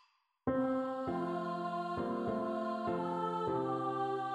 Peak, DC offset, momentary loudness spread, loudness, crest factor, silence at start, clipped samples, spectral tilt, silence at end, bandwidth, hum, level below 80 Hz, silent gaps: -22 dBFS; under 0.1%; 3 LU; -37 LUFS; 16 dB; 0.45 s; under 0.1%; -8 dB/octave; 0 s; 11 kHz; none; -68 dBFS; none